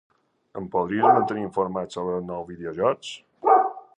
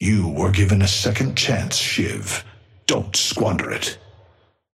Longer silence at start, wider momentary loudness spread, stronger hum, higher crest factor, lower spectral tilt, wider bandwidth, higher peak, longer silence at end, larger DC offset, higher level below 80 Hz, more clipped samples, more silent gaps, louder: first, 0.55 s vs 0 s; first, 15 LU vs 9 LU; neither; about the same, 20 dB vs 18 dB; first, -6 dB/octave vs -4 dB/octave; second, 9.6 kHz vs 14.5 kHz; about the same, -4 dBFS vs -4 dBFS; second, 0.2 s vs 0.8 s; neither; second, -60 dBFS vs -44 dBFS; neither; neither; second, -24 LUFS vs -20 LUFS